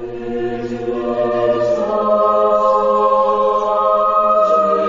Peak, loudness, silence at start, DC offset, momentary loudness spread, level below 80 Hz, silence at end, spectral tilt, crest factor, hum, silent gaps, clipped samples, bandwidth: -4 dBFS; -15 LUFS; 0 s; under 0.1%; 9 LU; -48 dBFS; 0 s; -6.5 dB/octave; 12 dB; none; none; under 0.1%; 7.4 kHz